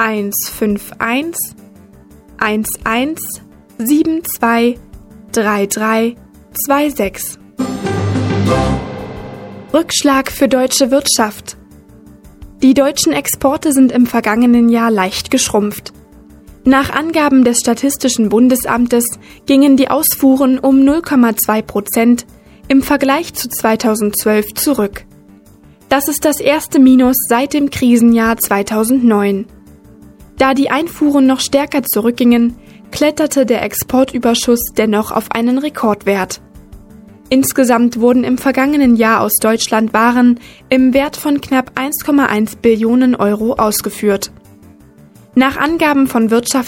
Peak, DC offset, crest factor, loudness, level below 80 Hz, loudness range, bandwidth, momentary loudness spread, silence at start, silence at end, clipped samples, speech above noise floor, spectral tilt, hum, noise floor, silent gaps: 0 dBFS; under 0.1%; 14 dB; -13 LUFS; -40 dBFS; 5 LU; 17 kHz; 9 LU; 0 s; 0 s; under 0.1%; 31 dB; -4 dB/octave; none; -43 dBFS; none